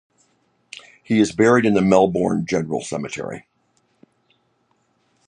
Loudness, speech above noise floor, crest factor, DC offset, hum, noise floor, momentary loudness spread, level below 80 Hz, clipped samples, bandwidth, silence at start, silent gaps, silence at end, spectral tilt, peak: -19 LUFS; 48 dB; 20 dB; under 0.1%; none; -66 dBFS; 24 LU; -54 dBFS; under 0.1%; 10.5 kHz; 1.1 s; none; 1.85 s; -6 dB/octave; -2 dBFS